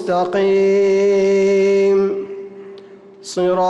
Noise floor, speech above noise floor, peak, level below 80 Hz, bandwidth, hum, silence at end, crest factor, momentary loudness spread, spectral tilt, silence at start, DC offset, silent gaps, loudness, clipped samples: -40 dBFS; 25 dB; -8 dBFS; -58 dBFS; 9 kHz; none; 0 s; 8 dB; 18 LU; -6 dB/octave; 0 s; under 0.1%; none; -15 LUFS; under 0.1%